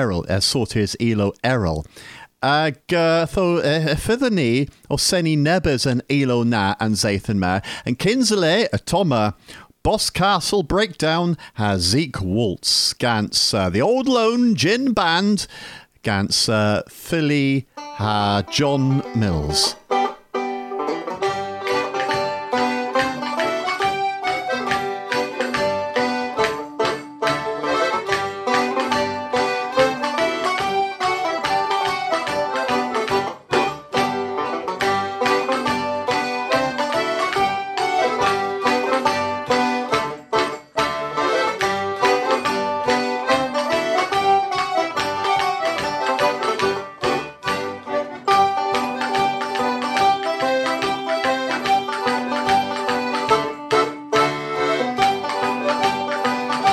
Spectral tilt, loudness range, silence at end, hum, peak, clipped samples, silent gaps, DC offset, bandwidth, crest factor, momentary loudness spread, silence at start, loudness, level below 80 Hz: -4.5 dB/octave; 3 LU; 0 s; none; -4 dBFS; under 0.1%; none; under 0.1%; 16.5 kHz; 16 dB; 6 LU; 0 s; -20 LUFS; -46 dBFS